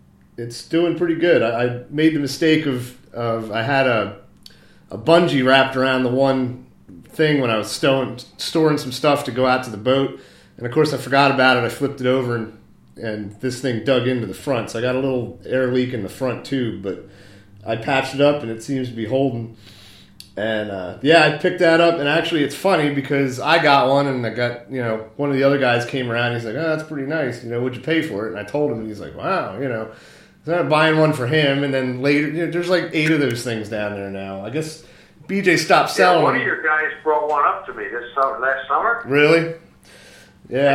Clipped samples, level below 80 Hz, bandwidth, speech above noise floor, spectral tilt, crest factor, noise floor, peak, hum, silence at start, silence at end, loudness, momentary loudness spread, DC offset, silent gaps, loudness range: under 0.1%; -58 dBFS; 16 kHz; 27 dB; -5.5 dB/octave; 20 dB; -46 dBFS; 0 dBFS; none; 0.4 s; 0 s; -19 LUFS; 13 LU; under 0.1%; none; 5 LU